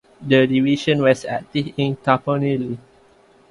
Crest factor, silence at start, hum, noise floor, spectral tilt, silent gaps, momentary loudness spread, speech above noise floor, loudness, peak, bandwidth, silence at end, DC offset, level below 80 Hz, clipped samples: 18 dB; 0.2 s; none; -53 dBFS; -6.5 dB/octave; none; 9 LU; 34 dB; -19 LUFS; 0 dBFS; 11.5 kHz; 0.7 s; under 0.1%; -56 dBFS; under 0.1%